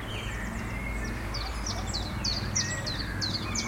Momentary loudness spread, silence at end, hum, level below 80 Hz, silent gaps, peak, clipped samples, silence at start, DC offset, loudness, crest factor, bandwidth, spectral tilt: 6 LU; 0 s; none; -38 dBFS; none; -16 dBFS; under 0.1%; 0 s; under 0.1%; -32 LUFS; 16 dB; 16.5 kHz; -3 dB/octave